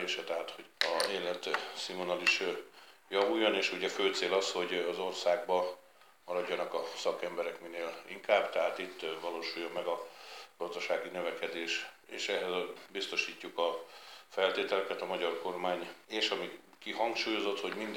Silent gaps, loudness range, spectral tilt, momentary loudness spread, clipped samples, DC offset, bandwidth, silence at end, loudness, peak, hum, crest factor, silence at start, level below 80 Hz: none; 5 LU; -2.5 dB/octave; 11 LU; under 0.1%; under 0.1%; 18 kHz; 0 s; -34 LUFS; -10 dBFS; none; 26 dB; 0 s; under -90 dBFS